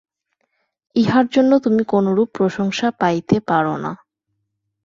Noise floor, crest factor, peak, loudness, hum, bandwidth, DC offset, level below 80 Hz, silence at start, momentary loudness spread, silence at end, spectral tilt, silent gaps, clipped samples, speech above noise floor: -74 dBFS; 16 dB; -2 dBFS; -18 LUFS; none; 7.6 kHz; under 0.1%; -56 dBFS; 0.95 s; 9 LU; 0.9 s; -6.5 dB/octave; none; under 0.1%; 57 dB